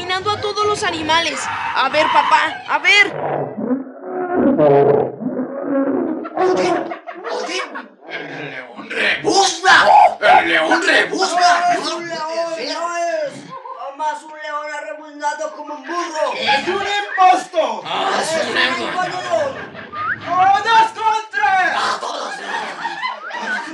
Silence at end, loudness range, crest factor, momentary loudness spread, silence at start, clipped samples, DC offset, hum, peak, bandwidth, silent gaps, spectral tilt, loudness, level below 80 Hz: 0 s; 9 LU; 16 dB; 15 LU; 0 s; under 0.1%; under 0.1%; none; 0 dBFS; 12 kHz; none; -3 dB/octave; -16 LUFS; -62 dBFS